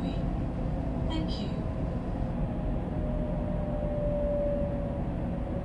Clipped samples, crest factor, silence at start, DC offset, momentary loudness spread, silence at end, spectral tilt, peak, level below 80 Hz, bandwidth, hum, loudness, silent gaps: under 0.1%; 12 dB; 0 s; under 0.1%; 4 LU; 0 s; -9 dB/octave; -18 dBFS; -36 dBFS; 8.2 kHz; none; -32 LUFS; none